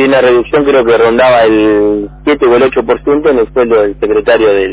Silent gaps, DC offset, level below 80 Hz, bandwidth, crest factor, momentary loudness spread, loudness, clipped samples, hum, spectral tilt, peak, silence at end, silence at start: none; under 0.1%; -34 dBFS; 4 kHz; 8 dB; 5 LU; -9 LUFS; 0.2%; none; -9.5 dB/octave; 0 dBFS; 0 s; 0 s